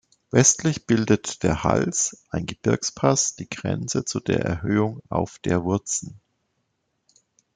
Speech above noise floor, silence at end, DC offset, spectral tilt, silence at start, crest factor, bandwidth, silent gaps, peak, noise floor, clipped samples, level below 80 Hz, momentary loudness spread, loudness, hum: 51 dB; 1.4 s; under 0.1%; -4.5 dB/octave; 0.35 s; 22 dB; 10 kHz; none; -2 dBFS; -74 dBFS; under 0.1%; -50 dBFS; 10 LU; -23 LUFS; none